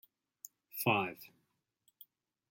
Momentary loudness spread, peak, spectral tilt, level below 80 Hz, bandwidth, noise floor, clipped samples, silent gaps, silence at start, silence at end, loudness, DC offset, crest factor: 22 LU; -16 dBFS; -4.5 dB/octave; -82 dBFS; 16.5 kHz; -81 dBFS; under 0.1%; none; 0.75 s; 1.25 s; -35 LUFS; under 0.1%; 26 dB